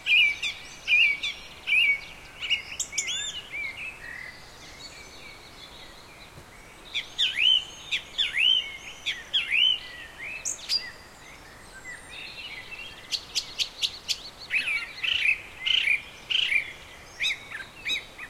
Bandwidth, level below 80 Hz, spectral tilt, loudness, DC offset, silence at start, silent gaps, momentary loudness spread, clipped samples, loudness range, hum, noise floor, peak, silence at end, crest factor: 16.5 kHz; -56 dBFS; 1 dB/octave; -25 LUFS; under 0.1%; 0 s; none; 23 LU; under 0.1%; 10 LU; none; -47 dBFS; -10 dBFS; 0 s; 18 dB